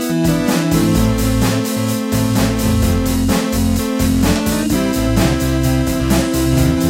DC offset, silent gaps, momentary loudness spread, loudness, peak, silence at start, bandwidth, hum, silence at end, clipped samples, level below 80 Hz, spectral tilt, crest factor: under 0.1%; none; 2 LU; -16 LUFS; 0 dBFS; 0 s; 16.5 kHz; none; 0 s; under 0.1%; -24 dBFS; -5.5 dB/octave; 14 dB